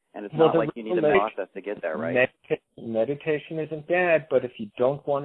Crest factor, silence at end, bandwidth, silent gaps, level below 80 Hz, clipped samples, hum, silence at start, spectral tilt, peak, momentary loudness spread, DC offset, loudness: 20 dB; 0 s; 4.1 kHz; none; -64 dBFS; under 0.1%; none; 0.15 s; -9.5 dB/octave; -6 dBFS; 11 LU; under 0.1%; -25 LUFS